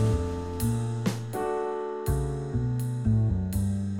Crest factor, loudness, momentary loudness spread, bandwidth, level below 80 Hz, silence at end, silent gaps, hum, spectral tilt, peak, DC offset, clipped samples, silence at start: 14 dB; -29 LUFS; 5 LU; 17 kHz; -38 dBFS; 0 s; none; none; -7.5 dB/octave; -14 dBFS; under 0.1%; under 0.1%; 0 s